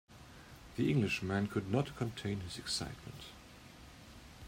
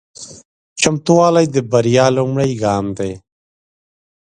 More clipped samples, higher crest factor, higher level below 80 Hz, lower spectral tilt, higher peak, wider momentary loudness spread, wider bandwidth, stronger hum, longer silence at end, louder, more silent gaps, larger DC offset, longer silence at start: neither; about the same, 20 dB vs 16 dB; second, -60 dBFS vs -50 dBFS; about the same, -5.5 dB/octave vs -5 dB/octave; second, -20 dBFS vs 0 dBFS; about the same, 21 LU vs 22 LU; first, 16 kHz vs 10.5 kHz; neither; second, 0 s vs 1.05 s; second, -37 LUFS vs -15 LUFS; second, none vs 0.45-0.76 s; neither; about the same, 0.1 s vs 0.2 s